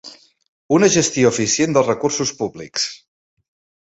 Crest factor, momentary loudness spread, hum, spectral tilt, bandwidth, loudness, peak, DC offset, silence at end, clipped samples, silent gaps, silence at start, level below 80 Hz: 18 dB; 9 LU; none; -3.5 dB/octave; 8.4 kHz; -17 LUFS; -2 dBFS; under 0.1%; 0.9 s; under 0.1%; 0.48-0.69 s; 0.05 s; -58 dBFS